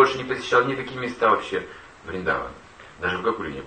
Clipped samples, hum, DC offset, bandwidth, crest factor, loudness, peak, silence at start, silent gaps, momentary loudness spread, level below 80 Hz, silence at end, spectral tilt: under 0.1%; none; under 0.1%; 9 kHz; 22 dB; -24 LUFS; -4 dBFS; 0 s; none; 16 LU; -52 dBFS; 0 s; -5 dB/octave